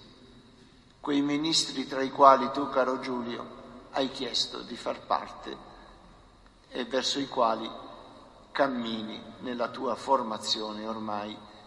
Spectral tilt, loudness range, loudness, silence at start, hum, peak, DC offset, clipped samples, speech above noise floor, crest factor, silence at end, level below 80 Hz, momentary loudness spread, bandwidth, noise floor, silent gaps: -3 dB/octave; 7 LU; -29 LUFS; 0 s; none; -4 dBFS; under 0.1%; under 0.1%; 28 dB; 26 dB; 0 s; -62 dBFS; 15 LU; 11.5 kHz; -56 dBFS; none